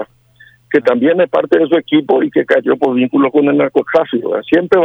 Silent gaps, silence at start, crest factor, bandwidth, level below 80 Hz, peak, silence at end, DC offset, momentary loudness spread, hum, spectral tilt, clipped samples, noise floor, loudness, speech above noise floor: none; 0 s; 12 dB; 6.2 kHz; -58 dBFS; 0 dBFS; 0 s; under 0.1%; 3 LU; none; -7.5 dB/octave; under 0.1%; -46 dBFS; -13 LUFS; 34 dB